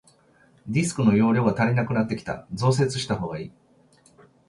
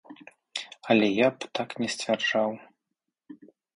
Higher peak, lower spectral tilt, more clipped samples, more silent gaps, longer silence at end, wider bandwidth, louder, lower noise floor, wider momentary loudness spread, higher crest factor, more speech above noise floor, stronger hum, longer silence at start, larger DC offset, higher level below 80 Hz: about the same, -8 dBFS vs -8 dBFS; first, -6.5 dB/octave vs -4 dB/octave; neither; neither; first, 1 s vs 0.4 s; about the same, 11.5 kHz vs 11 kHz; first, -23 LUFS vs -27 LUFS; second, -58 dBFS vs -84 dBFS; about the same, 13 LU vs 14 LU; second, 16 dB vs 22 dB; second, 36 dB vs 59 dB; neither; first, 0.65 s vs 0.1 s; neither; first, -54 dBFS vs -72 dBFS